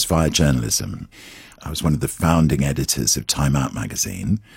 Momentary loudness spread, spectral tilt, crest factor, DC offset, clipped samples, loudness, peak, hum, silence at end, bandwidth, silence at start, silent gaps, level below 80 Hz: 17 LU; -4.5 dB/octave; 18 dB; under 0.1%; under 0.1%; -20 LUFS; -2 dBFS; none; 0.15 s; 16.5 kHz; 0 s; none; -34 dBFS